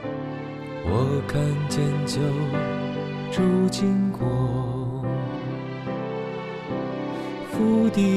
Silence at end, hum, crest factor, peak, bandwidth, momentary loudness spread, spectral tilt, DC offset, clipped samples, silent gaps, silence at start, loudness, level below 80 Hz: 0 s; none; 14 dB; -10 dBFS; 13.5 kHz; 10 LU; -7 dB/octave; under 0.1%; under 0.1%; none; 0 s; -25 LUFS; -50 dBFS